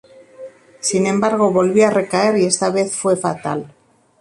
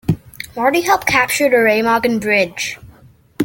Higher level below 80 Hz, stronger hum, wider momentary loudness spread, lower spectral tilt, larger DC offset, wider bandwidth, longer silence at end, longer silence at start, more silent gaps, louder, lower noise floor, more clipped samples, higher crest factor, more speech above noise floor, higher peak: second, -60 dBFS vs -46 dBFS; neither; about the same, 9 LU vs 11 LU; about the same, -4.5 dB/octave vs -4 dB/octave; neither; second, 11.5 kHz vs 17 kHz; first, 0.55 s vs 0 s; first, 0.4 s vs 0.1 s; neither; about the same, -17 LUFS vs -15 LUFS; second, -38 dBFS vs -46 dBFS; neither; about the same, 16 dB vs 16 dB; second, 22 dB vs 31 dB; about the same, -2 dBFS vs 0 dBFS